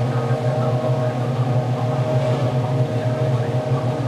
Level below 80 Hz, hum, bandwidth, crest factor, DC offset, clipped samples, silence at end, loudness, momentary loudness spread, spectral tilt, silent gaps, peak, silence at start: -52 dBFS; none; 9.6 kHz; 12 dB; under 0.1%; under 0.1%; 0 s; -21 LUFS; 1 LU; -8 dB/octave; none; -8 dBFS; 0 s